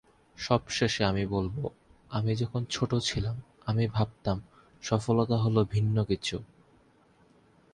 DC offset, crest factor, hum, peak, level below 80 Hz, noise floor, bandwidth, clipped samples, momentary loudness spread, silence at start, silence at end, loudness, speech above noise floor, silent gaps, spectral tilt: under 0.1%; 22 dB; none; -8 dBFS; -50 dBFS; -62 dBFS; 10.5 kHz; under 0.1%; 10 LU; 0.4 s; 1.3 s; -30 LUFS; 34 dB; none; -6 dB/octave